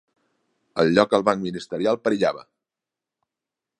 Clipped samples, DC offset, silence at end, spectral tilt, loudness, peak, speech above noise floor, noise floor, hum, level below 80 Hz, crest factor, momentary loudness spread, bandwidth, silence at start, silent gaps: under 0.1%; under 0.1%; 1.4 s; -6 dB/octave; -22 LUFS; -2 dBFS; 67 dB; -88 dBFS; none; -62 dBFS; 24 dB; 12 LU; 11 kHz; 0.75 s; none